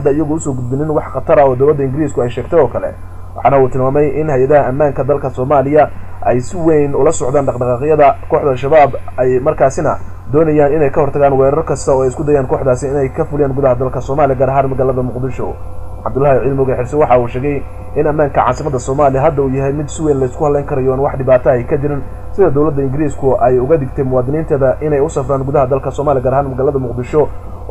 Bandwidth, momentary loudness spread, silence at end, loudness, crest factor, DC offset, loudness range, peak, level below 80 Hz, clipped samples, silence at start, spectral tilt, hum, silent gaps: 12 kHz; 7 LU; 0 s; -13 LUFS; 12 dB; under 0.1%; 2 LU; -2 dBFS; -30 dBFS; under 0.1%; 0 s; -8 dB/octave; none; none